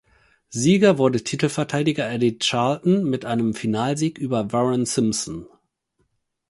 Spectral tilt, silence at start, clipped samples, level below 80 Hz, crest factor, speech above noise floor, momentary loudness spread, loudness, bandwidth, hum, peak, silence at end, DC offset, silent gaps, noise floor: -5 dB/octave; 0.5 s; under 0.1%; -58 dBFS; 18 dB; 50 dB; 8 LU; -21 LUFS; 11.5 kHz; none; -4 dBFS; 1 s; under 0.1%; none; -70 dBFS